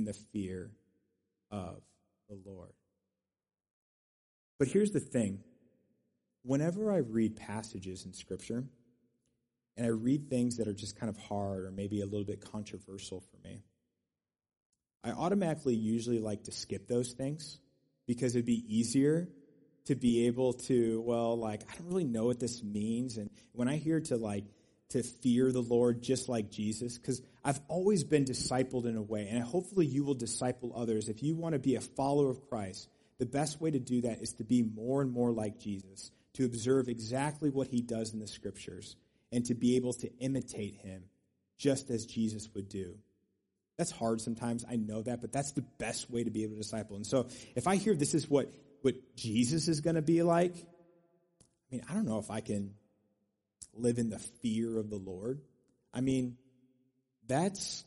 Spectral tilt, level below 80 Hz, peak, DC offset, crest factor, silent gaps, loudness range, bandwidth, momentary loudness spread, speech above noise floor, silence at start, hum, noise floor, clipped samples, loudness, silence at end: -6 dB/octave; -66 dBFS; -16 dBFS; under 0.1%; 20 dB; 3.71-4.59 s, 14.65-14.70 s; 6 LU; 11.5 kHz; 15 LU; over 56 dB; 0 s; none; under -90 dBFS; under 0.1%; -34 LUFS; 0.05 s